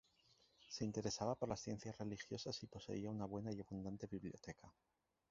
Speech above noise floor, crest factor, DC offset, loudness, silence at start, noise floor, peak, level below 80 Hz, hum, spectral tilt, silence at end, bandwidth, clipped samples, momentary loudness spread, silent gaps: 28 dB; 22 dB; under 0.1%; -48 LUFS; 0.6 s; -76 dBFS; -26 dBFS; -70 dBFS; none; -5.5 dB/octave; 0.6 s; 7.6 kHz; under 0.1%; 10 LU; none